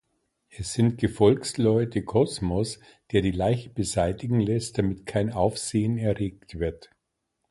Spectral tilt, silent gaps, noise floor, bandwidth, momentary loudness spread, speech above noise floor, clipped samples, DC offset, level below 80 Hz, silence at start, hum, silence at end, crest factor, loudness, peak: -6 dB/octave; none; -79 dBFS; 11.5 kHz; 10 LU; 54 dB; under 0.1%; under 0.1%; -46 dBFS; 0.55 s; none; 0.75 s; 20 dB; -26 LUFS; -6 dBFS